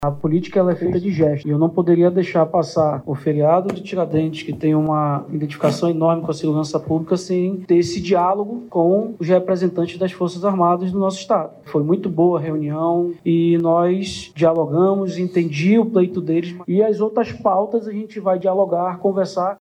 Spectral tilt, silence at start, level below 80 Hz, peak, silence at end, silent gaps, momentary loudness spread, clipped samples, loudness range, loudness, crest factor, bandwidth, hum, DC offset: -7.5 dB/octave; 0 s; -56 dBFS; -4 dBFS; 0.05 s; none; 6 LU; under 0.1%; 2 LU; -19 LUFS; 14 dB; 10.5 kHz; none; under 0.1%